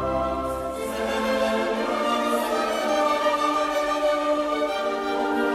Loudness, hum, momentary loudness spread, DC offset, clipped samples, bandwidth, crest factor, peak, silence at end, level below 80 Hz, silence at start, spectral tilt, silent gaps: -24 LUFS; none; 5 LU; under 0.1%; under 0.1%; 15 kHz; 12 dB; -10 dBFS; 0 s; -48 dBFS; 0 s; -4 dB/octave; none